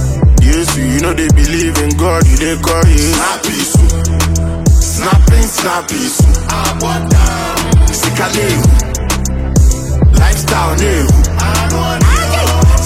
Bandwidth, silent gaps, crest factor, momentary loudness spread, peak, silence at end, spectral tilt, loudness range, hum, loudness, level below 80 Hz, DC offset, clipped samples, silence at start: 16 kHz; none; 10 dB; 5 LU; 0 dBFS; 0 s; -5 dB/octave; 1 LU; none; -11 LUFS; -12 dBFS; under 0.1%; under 0.1%; 0 s